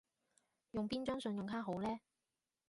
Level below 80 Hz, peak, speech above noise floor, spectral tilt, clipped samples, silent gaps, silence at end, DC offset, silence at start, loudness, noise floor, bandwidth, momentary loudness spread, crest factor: -70 dBFS; -28 dBFS; over 49 dB; -6.5 dB/octave; under 0.1%; none; 0.7 s; under 0.1%; 0.75 s; -43 LUFS; under -90 dBFS; 11.5 kHz; 5 LU; 16 dB